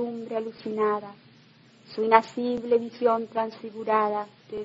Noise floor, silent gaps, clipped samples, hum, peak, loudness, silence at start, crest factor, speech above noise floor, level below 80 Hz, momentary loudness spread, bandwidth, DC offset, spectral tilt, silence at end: -55 dBFS; none; under 0.1%; none; -4 dBFS; -26 LUFS; 0 s; 22 dB; 30 dB; -72 dBFS; 13 LU; 7.8 kHz; under 0.1%; -6 dB/octave; 0 s